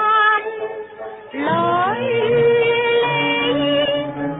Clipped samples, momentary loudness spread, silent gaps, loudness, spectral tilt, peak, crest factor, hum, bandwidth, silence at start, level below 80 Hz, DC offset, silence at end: under 0.1%; 14 LU; none; -17 LUFS; -10 dB/octave; -6 dBFS; 12 dB; none; 4 kHz; 0 s; -56 dBFS; under 0.1%; 0 s